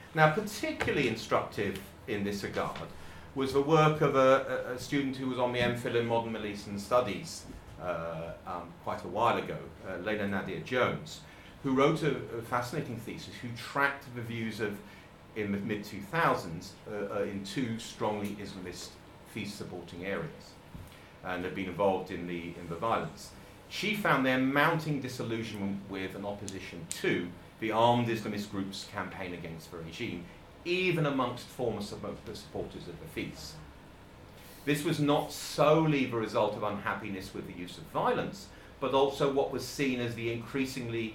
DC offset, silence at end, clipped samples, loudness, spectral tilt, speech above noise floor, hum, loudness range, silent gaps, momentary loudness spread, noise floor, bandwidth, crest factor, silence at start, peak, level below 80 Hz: under 0.1%; 0 s; under 0.1%; -32 LUFS; -5.5 dB/octave; 20 dB; none; 7 LU; none; 17 LU; -52 dBFS; 17 kHz; 26 dB; 0 s; -8 dBFS; -58 dBFS